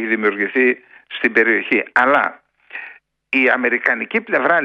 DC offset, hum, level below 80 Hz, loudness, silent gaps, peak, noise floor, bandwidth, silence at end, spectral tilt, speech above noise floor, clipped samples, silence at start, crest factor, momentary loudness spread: under 0.1%; none; -68 dBFS; -16 LUFS; none; 0 dBFS; -41 dBFS; 7.8 kHz; 0 s; -6 dB/octave; 24 dB; under 0.1%; 0 s; 18 dB; 18 LU